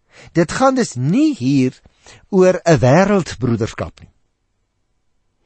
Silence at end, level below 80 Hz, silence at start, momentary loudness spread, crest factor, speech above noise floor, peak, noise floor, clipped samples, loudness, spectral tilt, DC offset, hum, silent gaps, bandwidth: 1.4 s; -44 dBFS; 0.35 s; 10 LU; 16 dB; 52 dB; -2 dBFS; -68 dBFS; under 0.1%; -16 LUFS; -6.5 dB/octave; under 0.1%; none; none; 8.8 kHz